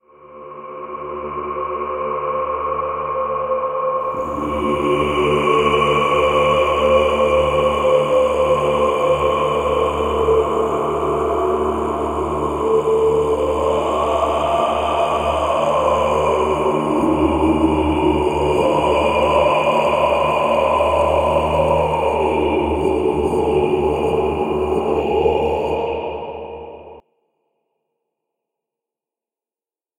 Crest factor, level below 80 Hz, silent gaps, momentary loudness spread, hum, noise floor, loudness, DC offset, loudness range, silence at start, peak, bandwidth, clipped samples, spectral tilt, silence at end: 16 dB; -38 dBFS; none; 7 LU; none; under -90 dBFS; -17 LUFS; under 0.1%; 6 LU; 0.25 s; -2 dBFS; 16 kHz; under 0.1%; -6 dB/octave; 3 s